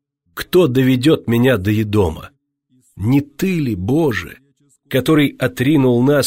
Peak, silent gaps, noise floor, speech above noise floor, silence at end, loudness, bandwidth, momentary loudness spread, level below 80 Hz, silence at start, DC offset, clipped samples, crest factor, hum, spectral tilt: -4 dBFS; none; -60 dBFS; 45 dB; 0 s; -16 LUFS; 16.5 kHz; 11 LU; -44 dBFS; 0.35 s; under 0.1%; under 0.1%; 12 dB; none; -6.5 dB/octave